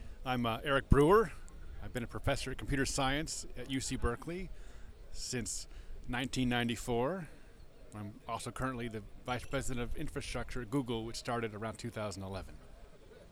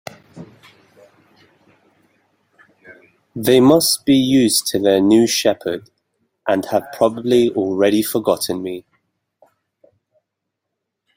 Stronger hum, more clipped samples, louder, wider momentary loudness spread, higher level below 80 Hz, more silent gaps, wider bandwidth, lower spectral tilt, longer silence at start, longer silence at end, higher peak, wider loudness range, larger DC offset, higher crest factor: neither; neither; second, -36 LUFS vs -16 LUFS; first, 18 LU vs 14 LU; first, -44 dBFS vs -58 dBFS; neither; about the same, 16.5 kHz vs 16.5 kHz; about the same, -5 dB/octave vs -4 dB/octave; second, 0 s vs 0.35 s; second, 0 s vs 2.35 s; second, -12 dBFS vs -2 dBFS; about the same, 7 LU vs 7 LU; neither; first, 24 dB vs 18 dB